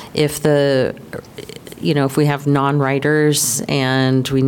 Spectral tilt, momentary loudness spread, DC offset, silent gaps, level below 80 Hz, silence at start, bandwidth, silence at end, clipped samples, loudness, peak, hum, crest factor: -5 dB/octave; 17 LU; under 0.1%; none; -50 dBFS; 0 s; 18 kHz; 0 s; under 0.1%; -16 LUFS; -4 dBFS; none; 12 dB